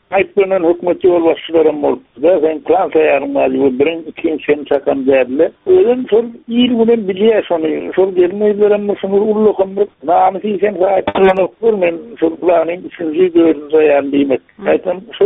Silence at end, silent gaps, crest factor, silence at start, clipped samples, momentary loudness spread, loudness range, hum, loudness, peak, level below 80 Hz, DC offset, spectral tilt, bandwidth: 0 s; none; 12 dB; 0.1 s; under 0.1%; 6 LU; 1 LU; none; -13 LUFS; 0 dBFS; -52 dBFS; under 0.1%; -4.5 dB/octave; 4 kHz